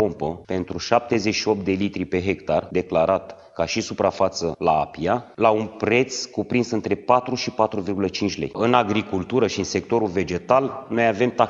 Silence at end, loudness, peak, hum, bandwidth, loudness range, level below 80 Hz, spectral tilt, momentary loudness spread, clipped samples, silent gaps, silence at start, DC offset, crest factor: 0 s; -22 LUFS; 0 dBFS; none; 7.8 kHz; 1 LU; -52 dBFS; -5 dB/octave; 6 LU; under 0.1%; none; 0 s; under 0.1%; 22 dB